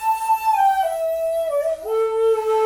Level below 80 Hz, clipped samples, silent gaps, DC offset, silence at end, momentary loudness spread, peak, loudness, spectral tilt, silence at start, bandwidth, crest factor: -56 dBFS; under 0.1%; none; under 0.1%; 0 s; 5 LU; -8 dBFS; -20 LUFS; -1.5 dB/octave; 0 s; 17.5 kHz; 12 dB